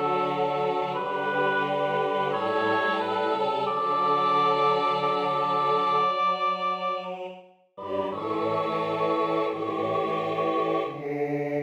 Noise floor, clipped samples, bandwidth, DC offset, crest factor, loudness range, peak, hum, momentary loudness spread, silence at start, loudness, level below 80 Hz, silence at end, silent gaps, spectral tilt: -47 dBFS; under 0.1%; 9.2 kHz; under 0.1%; 14 dB; 4 LU; -12 dBFS; none; 7 LU; 0 s; -26 LUFS; -72 dBFS; 0 s; none; -6 dB/octave